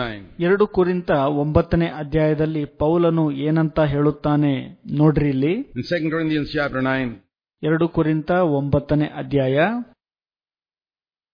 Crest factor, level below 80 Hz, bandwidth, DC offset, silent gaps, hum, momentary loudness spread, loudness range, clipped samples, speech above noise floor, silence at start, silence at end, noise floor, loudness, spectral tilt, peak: 16 dB; -42 dBFS; 5.2 kHz; under 0.1%; none; none; 6 LU; 2 LU; under 0.1%; over 71 dB; 0 s; 1.5 s; under -90 dBFS; -20 LUFS; -9.5 dB/octave; -4 dBFS